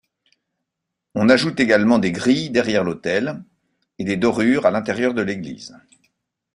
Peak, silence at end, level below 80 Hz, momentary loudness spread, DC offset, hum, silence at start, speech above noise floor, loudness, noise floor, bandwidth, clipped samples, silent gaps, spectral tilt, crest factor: -2 dBFS; 0.8 s; -56 dBFS; 14 LU; under 0.1%; none; 1.15 s; 62 dB; -19 LUFS; -81 dBFS; 11 kHz; under 0.1%; none; -5.5 dB/octave; 18 dB